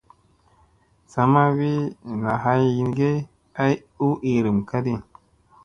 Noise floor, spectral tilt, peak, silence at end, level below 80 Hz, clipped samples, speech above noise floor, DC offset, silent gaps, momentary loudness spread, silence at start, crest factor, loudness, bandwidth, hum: -59 dBFS; -8.5 dB/octave; -2 dBFS; 0.65 s; -54 dBFS; under 0.1%; 38 dB; under 0.1%; none; 10 LU; 1.15 s; 20 dB; -22 LUFS; 7.4 kHz; none